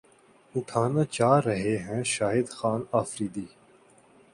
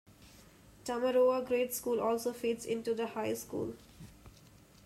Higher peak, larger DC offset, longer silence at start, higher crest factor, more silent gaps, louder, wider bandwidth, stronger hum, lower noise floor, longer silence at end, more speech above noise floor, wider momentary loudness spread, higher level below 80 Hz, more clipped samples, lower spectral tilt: first, -6 dBFS vs -20 dBFS; neither; first, 0.55 s vs 0.2 s; first, 22 dB vs 16 dB; neither; first, -27 LUFS vs -34 LUFS; second, 11.5 kHz vs 15.5 kHz; neither; about the same, -59 dBFS vs -59 dBFS; first, 0.85 s vs 0.55 s; first, 32 dB vs 26 dB; second, 12 LU vs 20 LU; about the same, -62 dBFS vs -66 dBFS; neither; first, -5.5 dB/octave vs -4 dB/octave